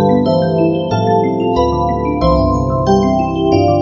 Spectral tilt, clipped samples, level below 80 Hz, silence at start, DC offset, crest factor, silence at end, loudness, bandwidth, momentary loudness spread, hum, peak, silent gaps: -8 dB/octave; under 0.1%; -28 dBFS; 0 s; 0.1%; 12 dB; 0 s; -14 LUFS; 7.2 kHz; 3 LU; none; 0 dBFS; none